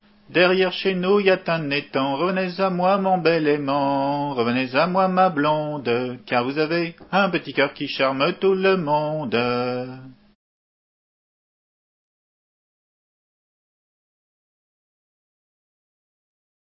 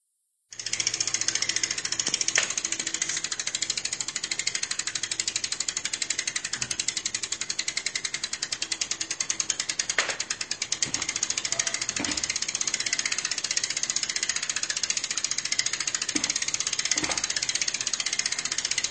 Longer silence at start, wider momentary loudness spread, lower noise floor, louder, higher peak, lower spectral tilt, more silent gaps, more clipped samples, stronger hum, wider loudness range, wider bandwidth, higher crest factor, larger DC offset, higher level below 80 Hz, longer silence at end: second, 0.3 s vs 0.5 s; about the same, 6 LU vs 4 LU; first, under -90 dBFS vs -74 dBFS; first, -21 LUFS vs -26 LUFS; first, -2 dBFS vs -6 dBFS; first, -10 dB/octave vs 1 dB/octave; neither; neither; neither; first, 6 LU vs 2 LU; second, 5.8 kHz vs 11 kHz; about the same, 22 dB vs 24 dB; neither; about the same, -66 dBFS vs -64 dBFS; first, 6.65 s vs 0 s